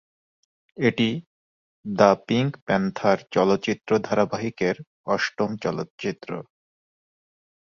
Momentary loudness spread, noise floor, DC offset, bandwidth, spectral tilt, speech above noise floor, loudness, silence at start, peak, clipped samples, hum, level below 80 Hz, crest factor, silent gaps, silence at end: 13 LU; under -90 dBFS; under 0.1%; 7.4 kHz; -6 dB/octave; over 67 dB; -24 LUFS; 0.8 s; -2 dBFS; under 0.1%; none; -60 dBFS; 22 dB; 1.26-1.84 s, 2.62-2.66 s, 4.87-5.04 s, 5.90-5.98 s; 1.25 s